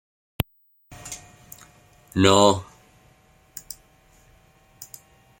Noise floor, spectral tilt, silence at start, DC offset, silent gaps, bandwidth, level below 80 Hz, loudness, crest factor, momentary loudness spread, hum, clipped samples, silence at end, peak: -58 dBFS; -4.5 dB/octave; 0.4 s; under 0.1%; none; 16.5 kHz; -52 dBFS; -21 LUFS; 26 dB; 28 LU; none; under 0.1%; 0.55 s; 0 dBFS